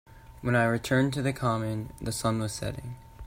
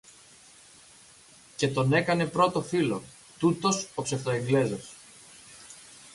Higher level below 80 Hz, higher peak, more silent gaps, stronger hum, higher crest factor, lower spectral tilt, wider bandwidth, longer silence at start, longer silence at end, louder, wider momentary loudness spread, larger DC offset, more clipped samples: first, -50 dBFS vs -64 dBFS; about the same, -10 dBFS vs -10 dBFS; neither; neither; about the same, 18 dB vs 20 dB; about the same, -5.5 dB/octave vs -5 dB/octave; first, 16 kHz vs 11.5 kHz; second, 0.1 s vs 1.6 s; about the same, 0 s vs 0.05 s; about the same, -29 LUFS vs -27 LUFS; second, 11 LU vs 23 LU; neither; neither